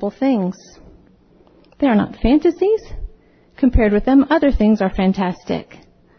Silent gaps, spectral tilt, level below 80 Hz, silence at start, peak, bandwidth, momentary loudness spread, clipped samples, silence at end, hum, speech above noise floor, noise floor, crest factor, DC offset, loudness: none; -8 dB/octave; -30 dBFS; 0 s; -4 dBFS; 6.4 kHz; 12 LU; under 0.1%; 0.55 s; none; 35 dB; -51 dBFS; 14 dB; under 0.1%; -17 LUFS